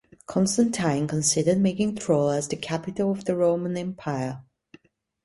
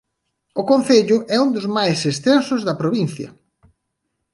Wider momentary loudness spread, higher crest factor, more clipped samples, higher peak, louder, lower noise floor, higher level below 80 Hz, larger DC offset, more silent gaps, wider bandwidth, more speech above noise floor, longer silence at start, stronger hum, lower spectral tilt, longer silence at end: about the same, 9 LU vs 11 LU; about the same, 18 dB vs 18 dB; neither; second, -8 dBFS vs -2 dBFS; second, -25 LUFS vs -18 LUFS; second, -55 dBFS vs -75 dBFS; about the same, -60 dBFS vs -62 dBFS; neither; neither; about the same, 11.5 kHz vs 11.5 kHz; second, 31 dB vs 58 dB; second, 0.3 s vs 0.55 s; neither; about the same, -5 dB/octave vs -5.5 dB/octave; second, 0.85 s vs 1 s